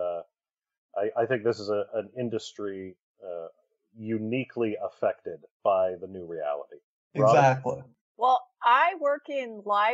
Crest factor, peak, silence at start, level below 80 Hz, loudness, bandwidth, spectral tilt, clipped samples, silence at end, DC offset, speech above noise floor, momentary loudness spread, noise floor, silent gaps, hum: 20 dB; -8 dBFS; 0 s; -78 dBFS; -27 LUFS; 8 kHz; -4.5 dB/octave; under 0.1%; 0 s; under 0.1%; over 63 dB; 18 LU; under -90 dBFS; 0.78-0.89 s, 3.00-3.15 s, 5.51-5.60 s, 6.84-7.11 s, 8.01-8.15 s; none